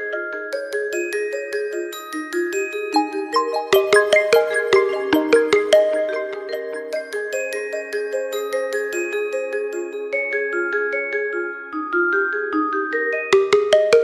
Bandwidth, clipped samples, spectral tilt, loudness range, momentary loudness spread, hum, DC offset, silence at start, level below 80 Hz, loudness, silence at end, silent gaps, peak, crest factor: 15 kHz; under 0.1%; -2.5 dB/octave; 7 LU; 11 LU; none; under 0.1%; 0 s; -64 dBFS; -20 LUFS; 0 s; none; -2 dBFS; 18 dB